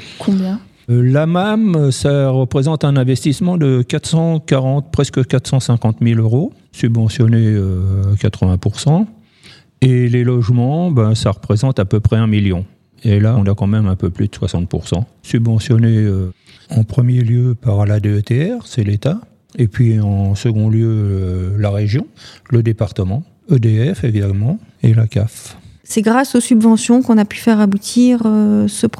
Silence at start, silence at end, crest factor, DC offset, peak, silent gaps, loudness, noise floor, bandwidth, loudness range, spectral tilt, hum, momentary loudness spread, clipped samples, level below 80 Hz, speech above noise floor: 0 s; 0.1 s; 14 dB; under 0.1%; 0 dBFS; none; -15 LUFS; -44 dBFS; 12.5 kHz; 3 LU; -7 dB/octave; none; 7 LU; under 0.1%; -42 dBFS; 31 dB